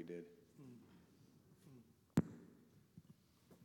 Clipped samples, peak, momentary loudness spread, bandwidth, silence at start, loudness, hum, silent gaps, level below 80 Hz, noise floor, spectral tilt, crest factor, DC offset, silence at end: under 0.1%; -22 dBFS; 27 LU; 17.5 kHz; 0 s; -44 LUFS; none; none; -76 dBFS; -69 dBFS; -8 dB/octave; 28 dB; under 0.1%; 0 s